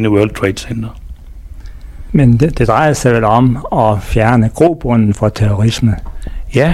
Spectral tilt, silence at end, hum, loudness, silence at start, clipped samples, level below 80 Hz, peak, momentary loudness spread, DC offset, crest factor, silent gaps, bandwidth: -7 dB/octave; 0 s; none; -12 LUFS; 0 s; under 0.1%; -26 dBFS; 0 dBFS; 12 LU; under 0.1%; 12 dB; none; 13.5 kHz